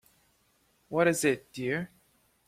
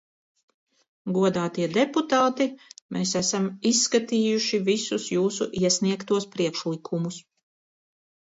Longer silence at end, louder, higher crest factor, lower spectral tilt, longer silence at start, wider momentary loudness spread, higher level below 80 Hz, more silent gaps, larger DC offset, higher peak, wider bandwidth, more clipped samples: second, 0.6 s vs 1.15 s; second, -29 LUFS vs -25 LUFS; first, 22 dB vs 16 dB; about the same, -4.5 dB/octave vs -4 dB/octave; second, 0.9 s vs 1.05 s; about the same, 10 LU vs 8 LU; about the same, -68 dBFS vs -68 dBFS; second, none vs 2.82-2.89 s; neither; about the same, -12 dBFS vs -10 dBFS; first, 16 kHz vs 8 kHz; neither